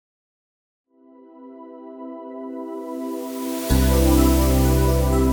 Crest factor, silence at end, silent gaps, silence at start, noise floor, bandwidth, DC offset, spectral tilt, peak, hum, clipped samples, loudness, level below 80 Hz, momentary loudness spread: 18 dB; 0 s; none; 1.35 s; -49 dBFS; over 20 kHz; under 0.1%; -6 dB/octave; -4 dBFS; none; under 0.1%; -20 LUFS; -26 dBFS; 21 LU